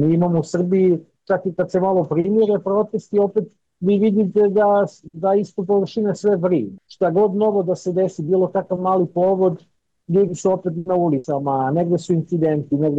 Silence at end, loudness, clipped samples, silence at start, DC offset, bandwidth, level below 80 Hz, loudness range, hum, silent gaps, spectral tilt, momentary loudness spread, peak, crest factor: 0 s; -19 LUFS; under 0.1%; 0 s; under 0.1%; 8.2 kHz; -60 dBFS; 2 LU; none; none; -8.5 dB/octave; 6 LU; -8 dBFS; 10 dB